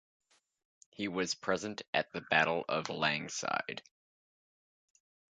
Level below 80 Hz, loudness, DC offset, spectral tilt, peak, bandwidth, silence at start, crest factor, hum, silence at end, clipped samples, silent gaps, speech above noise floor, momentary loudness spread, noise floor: -74 dBFS; -34 LUFS; under 0.1%; -3 dB/octave; -12 dBFS; 9.4 kHz; 1 s; 26 dB; none; 1.6 s; under 0.1%; 1.88-1.93 s; over 55 dB; 9 LU; under -90 dBFS